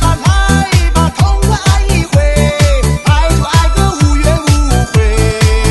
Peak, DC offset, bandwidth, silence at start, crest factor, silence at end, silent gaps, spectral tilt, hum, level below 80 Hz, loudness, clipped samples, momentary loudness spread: 0 dBFS; 0.4%; 12.5 kHz; 0 s; 10 dB; 0 s; none; -5 dB/octave; none; -12 dBFS; -11 LUFS; 0.3%; 1 LU